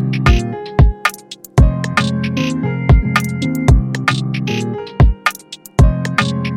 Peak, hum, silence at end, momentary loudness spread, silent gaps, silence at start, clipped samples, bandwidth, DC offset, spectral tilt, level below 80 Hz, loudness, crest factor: 0 dBFS; none; 0 s; 6 LU; none; 0 s; under 0.1%; 16 kHz; under 0.1%; -6 dB/octave; -18 dBFS; -16 LUFS; 14 dB